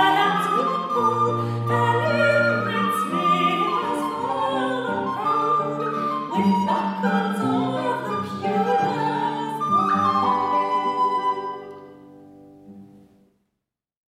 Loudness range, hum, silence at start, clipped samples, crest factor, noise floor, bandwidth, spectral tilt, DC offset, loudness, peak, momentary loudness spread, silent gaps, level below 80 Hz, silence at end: 4 LU; none; 0 s; under 0.1%; 16 dB; -82 dBFS; 15.5 kHz; -6 dB/octave; under 0.1%; -22 LUFS; -6 dBFS; 6 LU; none; -70 dBFS; 1.3 s